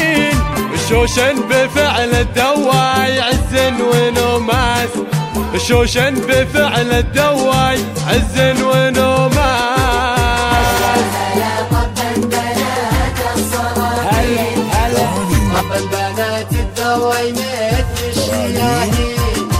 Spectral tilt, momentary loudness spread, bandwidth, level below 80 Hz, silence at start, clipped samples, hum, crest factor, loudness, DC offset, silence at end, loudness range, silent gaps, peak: -4.5 dB/octave; 5 LU; 16 kHz; -24 dBFS; 0 s; under 0.1%; none; 14 dB; -14 LUFS; under 0.1%; 0 s; 3 LU; none; 0 dBFS